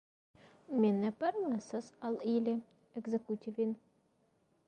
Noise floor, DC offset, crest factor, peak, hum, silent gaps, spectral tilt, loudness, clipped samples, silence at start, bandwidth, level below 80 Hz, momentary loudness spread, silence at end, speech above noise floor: -74 dBFS; under 0.1%; 18 dB; -20 dBFS; none; none; -7.5 dB/octave; -36 LUFS; under 0.1%; 0.7 s; 9.2 kHz; -82 dBFS; 11 LU; 0.9 s; 39 dB